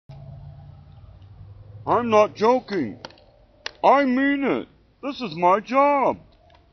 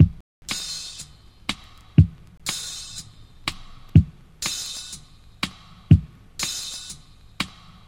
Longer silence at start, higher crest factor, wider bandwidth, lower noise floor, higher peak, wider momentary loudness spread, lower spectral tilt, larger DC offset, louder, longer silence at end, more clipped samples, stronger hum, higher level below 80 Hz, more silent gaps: about the same, 0.1 s vs 0 s; about the same, 20 dB vs 24 dB; second, 6.4 kHz vs 16.5 kHz; first, -54 dBFS vs -44 dBFS; second, -4 dBFS vs 0 dBFS; first, 23 LU vs 20 LU; about the same, -4 dB/octave vs -4.5 dB/octave; neither; first, -21 LUFS vs -25 LUFS; first, 0.55 s vs 0.4 s; neither; neither; second, -54 dBFS vs -36 dBFS; second, none vs 0.20-0.42 s